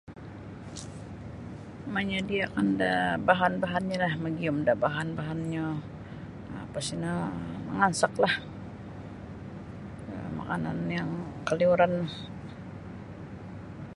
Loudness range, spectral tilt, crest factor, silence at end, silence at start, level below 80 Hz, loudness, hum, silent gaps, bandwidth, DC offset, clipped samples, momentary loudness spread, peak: 5 LU; -5.5 dB/octave; 24 dB; 0 s; 0.05 s; -54 dBFS; -29 LUFS; none; none; 11.5 kHz; under 0.1%; under 0.1%; 17 LU; -6 dBFS